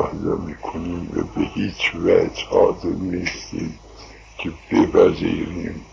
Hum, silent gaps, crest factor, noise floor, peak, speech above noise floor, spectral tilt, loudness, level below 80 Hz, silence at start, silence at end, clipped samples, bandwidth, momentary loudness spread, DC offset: none; none; 20 dB; -42 dBFS; 0 dBFS; 21 dB; -6 dB/octave; -21 LUFS; -40 dBFS; 0 s; 0.05 s; under 0.1%; 7.6 kHz; 14 LU; under 0.1%